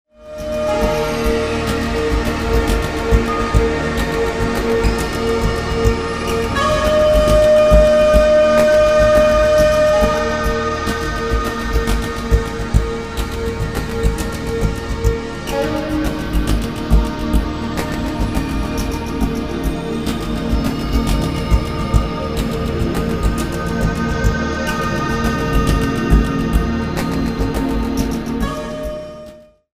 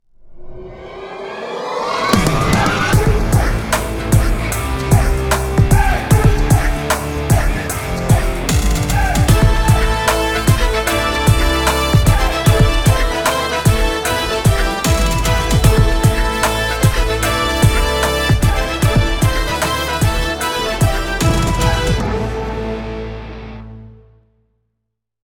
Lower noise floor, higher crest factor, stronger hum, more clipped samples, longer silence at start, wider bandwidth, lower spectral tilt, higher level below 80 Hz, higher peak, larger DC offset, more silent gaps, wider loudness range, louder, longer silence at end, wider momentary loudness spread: second, -39 dBFS vs -75 dBFS; about the same, 16 dB vs 14 dB; neither; neither; about the same, 0.2 s vs 0.25 s; second, 16 kHz vs over 20 kHz; about the same, -6 dB/octave vs -5 dB/octave; about the same, -22 dBFS vs -20 dBFS; about the same, 0 dBFS vs 0 dBFS; first, 0.9% vs under 0.1%; neither; first, 8 LU vs 4 LU; about the same, -17 LUFS vs -15 LUFS; second, 0.3 s vs 1.45 s; about the same, 10 LU vs 9 LU